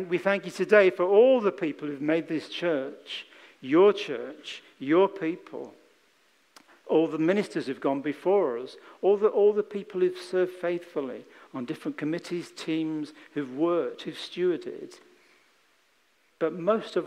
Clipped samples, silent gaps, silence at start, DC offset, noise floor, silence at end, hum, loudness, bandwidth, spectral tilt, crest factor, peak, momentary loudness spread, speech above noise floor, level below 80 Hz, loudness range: under 0.1%; none; 0 s; under 0.1%; -67 dBFS; 0 s; none; -27 LUFS; 11.5 kHz; -6 dB/octave; 22 dB; -6 dBFS; 17 LU; 41 dB; -84 dBFS; 7 LU